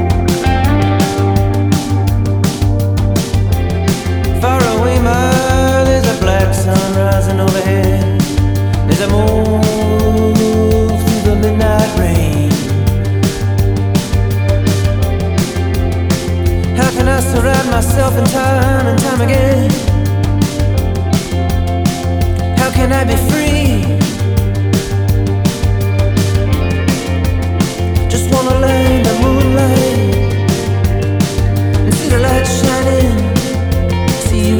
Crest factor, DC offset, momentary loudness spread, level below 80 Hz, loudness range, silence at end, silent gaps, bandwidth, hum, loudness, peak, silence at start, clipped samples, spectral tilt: 12 dB; under 0.1%; 4 LU; -20 dBFS; 2 LU; 0 s; none; over 20 kHz; none; -13 LUFS; 0 dBFS; 0 s; under 0.1%; -6 dB/octave